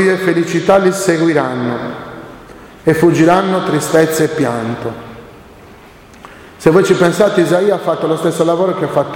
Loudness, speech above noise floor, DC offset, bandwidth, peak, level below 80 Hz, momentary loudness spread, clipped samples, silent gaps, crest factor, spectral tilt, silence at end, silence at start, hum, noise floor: -13 LUFS; 26 dB; under 0.1%; 17 kHz; 0 dBFS; -48 dBFS; 14 LU; under 0.1%; none; 14 dB; -5.5 dB/octave; 0 s; 0 s; none; -39 dBFS